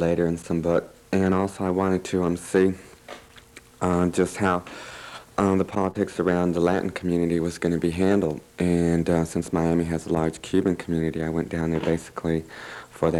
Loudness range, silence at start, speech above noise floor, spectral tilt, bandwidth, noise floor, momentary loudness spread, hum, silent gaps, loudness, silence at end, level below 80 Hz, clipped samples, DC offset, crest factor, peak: 2 LU; 0 s; 25 dB; -7 dB/octave; 13.5 kHz; -49 dBFS; 9 LU; none; none; -24 LUFS; 0 s; -50 dBFS; under 0.1%; under 0.1%; 16 dB; -8 dBFS